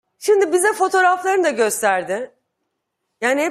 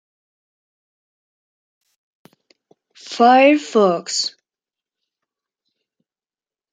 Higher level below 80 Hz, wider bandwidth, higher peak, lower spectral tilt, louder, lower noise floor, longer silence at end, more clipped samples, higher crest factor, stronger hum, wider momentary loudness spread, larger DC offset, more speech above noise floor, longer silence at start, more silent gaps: first, -70 dBFS vs -80 dBFS; first, 15.5 kHz vs 9.6 kHz; about the same, -4 dBFS vs -2 dBFS; about the same, -2.5 dB/octave vs -3.5 dB/octave; second, -18 LUFS vs -15 LUFS; second, -75 dBFS vs under -90 dBFS; second, 0 s vs 2.45 s; neither; about the same, 16 dB vs 20 dB; neither; second, 9 LU vs 13 LU; neither; second, 58 dB vs over 75 dB; second, 0.2 s vs 3.05 s; neither